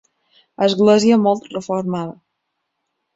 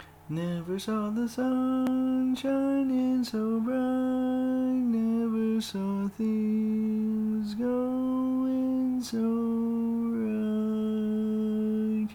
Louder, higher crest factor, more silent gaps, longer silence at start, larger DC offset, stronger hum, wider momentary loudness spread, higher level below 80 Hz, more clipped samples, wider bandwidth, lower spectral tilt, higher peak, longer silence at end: first, -17 LUFS vs -28 LUFS; first, 16 dB vs 10 dB; neither; first, 0.6 s vs 0 s; neither; neither; first, 12 LU vs 4 LU; about the same, -62 dBFS vs -64 dBFS; neither; second, 8 kHz vs 15.5 kHz; about the same, -6 dB/octave vs -7 dB/octave; first, -2 dBFS vs -18 dBFS; first, 1.05 s vs 0 s